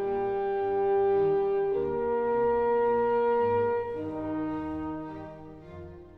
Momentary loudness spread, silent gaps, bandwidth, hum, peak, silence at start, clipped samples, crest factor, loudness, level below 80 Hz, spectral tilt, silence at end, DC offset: 17 LU; none; 4.6 kHz; none; -18 dBFS; 0 s; under 0.1%; 10 dB; -28 LUFS; -54 dBFS; -9 dB/octave; 0 s; under 0.1%